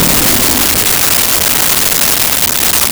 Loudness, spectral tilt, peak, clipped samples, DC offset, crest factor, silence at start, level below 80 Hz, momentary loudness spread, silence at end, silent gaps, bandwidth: -7 LUFS; -1 dB/octave; 0 dBFS; under 0.1%; under 0.1%; 10 dB; 0 s; -30 dBFS; 1 LU; 0 s; none; over 20 kHz